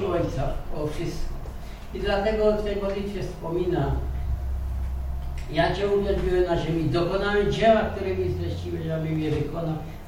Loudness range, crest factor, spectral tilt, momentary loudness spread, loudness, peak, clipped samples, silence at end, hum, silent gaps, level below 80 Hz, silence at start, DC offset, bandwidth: 4 LU; 18 dB; -7 dB/octave; 10 LU; -26 LUFS; -6 dBFS; under 0.1%; 0 s; none; none; -32 dBFS; 0 s; under 0.1%; 16 kHz